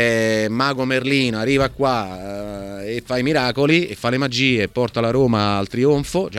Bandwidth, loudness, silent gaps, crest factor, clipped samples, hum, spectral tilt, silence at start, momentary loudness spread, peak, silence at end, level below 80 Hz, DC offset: 15 kHz; -19 LUFS; none; 18 dB; under 0.1%; none; -5.5 dB/octave; 0 s; 11 LU; -2 dBFS; 0 s; -44 dBFS; under 0.1%